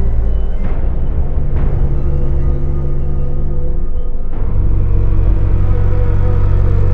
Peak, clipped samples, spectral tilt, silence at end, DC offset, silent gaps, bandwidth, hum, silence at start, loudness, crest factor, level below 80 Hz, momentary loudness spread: 0 dBFS; under 0.1%; -11 dB/octave; 0 s; under 0.1%; none; 2.6 kHz; none; 0 s; -18 LUFS; 10 dB; -12 dBFS; 6 LU